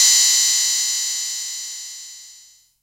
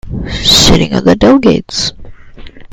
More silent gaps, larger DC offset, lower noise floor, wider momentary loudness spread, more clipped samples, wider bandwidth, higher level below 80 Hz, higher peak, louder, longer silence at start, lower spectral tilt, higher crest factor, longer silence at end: neither; neither; first, -49 dBFS vs -29 dBFS; first, 20 LU vs 11 LU; second, under 0.1% vs 1%; second, 16 kHz vs over 20 kHz; second, -72 dBFS vs -24 dBFS; second, -4 dBFS vs 0 dBFS; second, -16 LUFS vs -8 LUFS; about the same, 0 s vs 0.05 s; second, 7 dB/octave vs -4 dB/octave; first, 16 dB vs 10 dB; first, 0.5 s vs 0.05 s